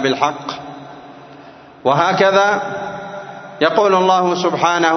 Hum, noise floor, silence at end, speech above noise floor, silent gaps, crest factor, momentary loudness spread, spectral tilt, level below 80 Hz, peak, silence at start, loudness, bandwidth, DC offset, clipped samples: none; -40 dBFS; 0 s; 25 dB; none; 16 dB; 19 LU; -4.5 dB/octave; -62 dBFS; 0 dBFS; 0 s; -15 LUFS; 6.4 kHz; under 0.1%; under 0.1%